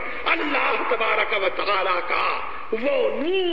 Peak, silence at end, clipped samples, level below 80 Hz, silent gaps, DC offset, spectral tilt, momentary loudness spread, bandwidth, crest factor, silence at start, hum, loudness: -6 dBFS; 0 s; under 0.1%; -54 dBFS; none; 3%; -5.5 dB/octave; 4 LU; 7.2 kHz; 16 dB; 0 s; none; -22 LUFS